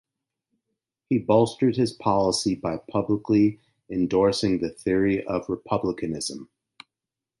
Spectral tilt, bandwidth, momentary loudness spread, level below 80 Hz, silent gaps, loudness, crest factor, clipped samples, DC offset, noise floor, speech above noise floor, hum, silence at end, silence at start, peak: -6 dB/octave; 11.5 kHz; 8 LU; -54 dBFS; none; -24 LUFS; 18 dB; under 0.1%; under 0.1%; -88 dBFS; 65 dB; none; 0.95 s; 1.1 s; -6 dBFS